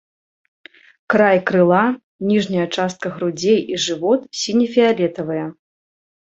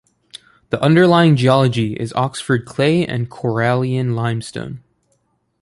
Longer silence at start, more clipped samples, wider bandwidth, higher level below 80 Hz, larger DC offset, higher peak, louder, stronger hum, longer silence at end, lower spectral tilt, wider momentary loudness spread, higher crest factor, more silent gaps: first, 1.1 s vs 0.35 s; neither; second, 8.2 kHz vs 11.5 kHz; second, -62 dBFS vs -52 dBFS; neither; about the same, 0 dBFS vs -2 dBFS; about the same, -18 LUFS vs -16 LUFS; neither; about the same, 0.8 s vs 0.85 s; second, -5 dB/octave vs -7 dB/octave; second, 9 LU vs 14 LU; about the same, 18 dB vs 16 dB; first, 2.03-2.19 s vs none